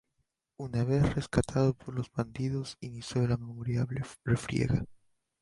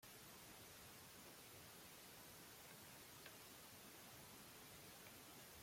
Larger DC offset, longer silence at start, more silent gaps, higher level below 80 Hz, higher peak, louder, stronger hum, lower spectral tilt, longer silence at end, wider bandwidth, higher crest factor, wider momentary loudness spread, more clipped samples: neither; first, 0.6 s vs 0 s; neither; first, -50 dBFS vs -82 dBFS; first, -12 dBFS vs -44 dBFS; first, -32 LUFS vs -59 LUFS; neither; first, -7 dB/octave vs -2.5 dB/octave; first, 0.45 s vs 0 s; second, 11.5 kHz vs 16.5 kHz; about the same, 20 dB vs 18 dB; first, 9 LU vs 1 LU; neither